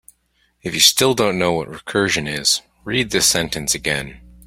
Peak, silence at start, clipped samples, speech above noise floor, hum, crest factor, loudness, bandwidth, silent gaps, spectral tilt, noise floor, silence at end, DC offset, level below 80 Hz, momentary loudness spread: 0 dBFS; 0.65 s; under 0.1%; 45 dB; none; 20 dB; -17 LUFS; 16.5 kHz; none; -2 dB/octave; -63 dBFS; 0.3 s; under 0.1%; -46 dBFS; 12 LU